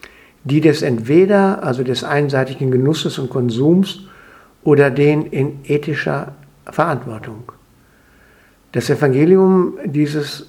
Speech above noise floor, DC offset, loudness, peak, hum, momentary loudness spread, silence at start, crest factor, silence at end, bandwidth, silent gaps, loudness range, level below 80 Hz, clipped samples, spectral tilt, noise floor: 36 dB; under 0.1%; -16 LUFS; 0 dBFS; none; 13 LU; 0.45 s; 16 dB; 0.05 s; 14.5 kHz; none; 7 LU; -56 dBFS; under 0.1%; -7 dB/octave; -51 dBFS